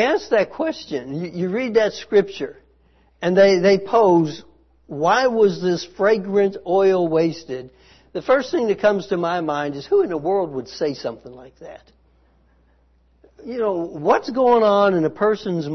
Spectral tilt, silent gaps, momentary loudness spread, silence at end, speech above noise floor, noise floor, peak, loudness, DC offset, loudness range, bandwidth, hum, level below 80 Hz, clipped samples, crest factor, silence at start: -6 dB/octave; none; 15 LU; 0 s; 39 dB; -58 dBFS; -4 dBFS; -19 LUFS; under 0.1%; 9 LU; 6.4 kHz; none; -58 dBFS; under 0.1%; 16 dB; 0 s